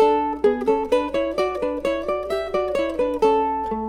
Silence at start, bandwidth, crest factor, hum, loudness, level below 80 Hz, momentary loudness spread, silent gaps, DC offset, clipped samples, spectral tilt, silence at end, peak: 0 s; 13.5 kHz; 16 dB; none; -22 LUFS; -46 dBFS; 5 LU; none; under 0.1%; under 0.1%; -5.5 dB/octave; 0 s; -6 dBFS